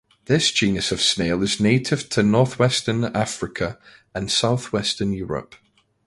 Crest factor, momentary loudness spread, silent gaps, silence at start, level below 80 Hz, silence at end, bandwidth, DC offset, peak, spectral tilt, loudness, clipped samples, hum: 18 dB; 10 LU; none; 0.3 s; -48 dBFS; 0.65 s; 11.5 kHz; under 0.1%; -4 dBFS; -4.5 dB/octave; -21 LUFS; under 0.1%; none